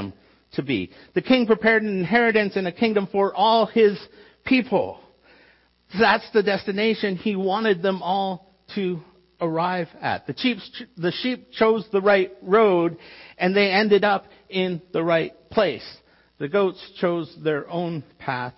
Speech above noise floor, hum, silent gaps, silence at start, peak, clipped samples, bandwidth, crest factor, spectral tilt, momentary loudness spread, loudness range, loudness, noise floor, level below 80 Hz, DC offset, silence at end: 36 dB; none; none; 0 s; -6 dBFS; under 0.1%; 5.8 kHz; 18 dB; -9.5 dB/octave; 13 LU; 5 LU; -22 LUFS; -58 dBFS; -62 dBFS; under 0.1%; 0.05 s